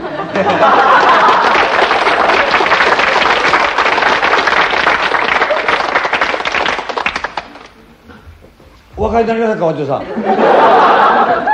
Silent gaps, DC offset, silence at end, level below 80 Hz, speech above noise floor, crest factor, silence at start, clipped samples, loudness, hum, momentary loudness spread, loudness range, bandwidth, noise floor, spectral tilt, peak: none; under 0.1%; 0 s; -40 dBFS; 31 dB; 12 dB; 0 s; 0.1%; -11 LUFS; none; 9 LU; 9 LU; 10 kHz; -41 dBFS; -4 dB/octave; 0 dBFS